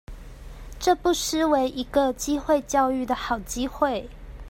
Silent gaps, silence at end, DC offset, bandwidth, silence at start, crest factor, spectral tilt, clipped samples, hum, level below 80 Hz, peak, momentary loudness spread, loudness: none; 0 s; under 0.1%; 16.5 kHz; 0.1 s; 18 dB; -3.5 dB/octave; under 0.1%; none; -42 dBFS; -8 dBFS; 22 LU; -24 LUFS